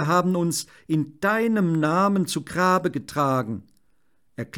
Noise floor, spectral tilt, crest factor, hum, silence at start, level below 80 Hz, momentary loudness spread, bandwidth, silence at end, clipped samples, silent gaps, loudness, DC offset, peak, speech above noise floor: -70 dBFS; -5.5 dB/octave; 16 dB; none; 0 s; -62 dBFS; 10 LU; 18.5 kHz; 0 s; under 0.1%; none; -23 LUFS; under 0.1%; -8 dBFS; 48 dB